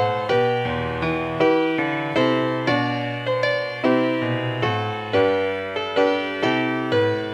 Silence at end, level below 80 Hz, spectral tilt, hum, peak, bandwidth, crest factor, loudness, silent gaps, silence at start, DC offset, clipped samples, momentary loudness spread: 0 s; -52 dBFS; -6.5 dB/octave; none; -6 dBFS; 9.4 kHz; 16 dB; -21 LUFS; none; 0 s; under 0.1%; under 0.1%; 5 LU